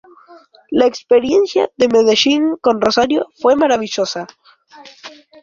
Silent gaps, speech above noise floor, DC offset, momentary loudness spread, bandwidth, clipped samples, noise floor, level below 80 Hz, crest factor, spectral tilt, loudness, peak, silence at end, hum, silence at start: none; 28 dB; under 0.1%; 10 LU; 7.6 kHz; under 0.1%; -42 dBFS; -54 dBFS; 14 dB; -3.5 dB/octave; -14 LUFS; 0 dBFS; 0.35 s; none; 0.3 s